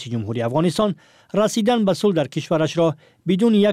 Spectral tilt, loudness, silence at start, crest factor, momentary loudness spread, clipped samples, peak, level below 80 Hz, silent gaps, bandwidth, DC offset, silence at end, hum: -6 dB/octave; -20 LUFS; 0 s; 12 dB; 8 LU; under 0.1%; -8 dBFS; -58 dBFS; none; 15 kHz; under 0.1%; 0 s; none